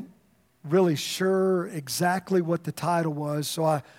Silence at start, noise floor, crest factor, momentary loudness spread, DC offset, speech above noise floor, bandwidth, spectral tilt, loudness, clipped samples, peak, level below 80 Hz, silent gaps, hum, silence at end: 0 s; -63 dBFS; 16 dB; 6 LU; under 0.1%; 38 dB; 16.5 kHz; -5.5 dB/octave; -26 LUFS; under 0.1%; -10 dBFS; -74 dBFS; none; none; 0.15 s